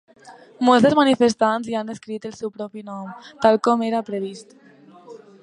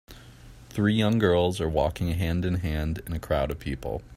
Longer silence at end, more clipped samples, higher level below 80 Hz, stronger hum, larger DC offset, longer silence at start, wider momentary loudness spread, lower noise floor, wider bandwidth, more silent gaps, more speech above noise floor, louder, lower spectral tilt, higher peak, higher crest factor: first, 0.25 s vs 0 s; neither; second, -64 dBFS vs -40 dBFS; neither; neither; first, 0.25 s vs 0.1 s; first, 18 LU vs 10 LU; about the same, -46 dBFS vs -48 dBFS; second, 10.5 kHz vs 16 kHz; neither; first, 26 dB vs 22 dB; first, -20 LUFS vs -26 LUFS; second, -5 dB/octave vs -7 dB/octave; first, -2 dBFS vs -8 dBFS; about the same, 20 dB vs 18 dB